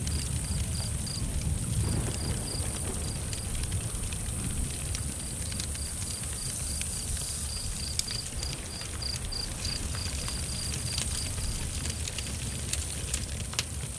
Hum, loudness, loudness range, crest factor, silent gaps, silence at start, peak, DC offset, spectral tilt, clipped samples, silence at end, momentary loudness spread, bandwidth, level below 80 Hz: none; -32 LUFS; 1 LU; 26 dB; none; 0 s; -8 dBFS; under 0.1%; -3 dB/octave; under 0.1%; 0 s; 3 LU; 11 kHz; -38 dBFS